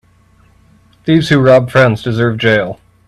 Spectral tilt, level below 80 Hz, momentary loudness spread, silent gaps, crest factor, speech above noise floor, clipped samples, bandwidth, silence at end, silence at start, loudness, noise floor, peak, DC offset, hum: -7 dB/octave; -44 dBFS; 8 LU; none; 12 dB; 38 dB; under 0.1%; 12.5 kHz; 0.35 s; 1.05 s; -11 LUFS; -49 dBFS; 0 dBFS; under 0.1%; none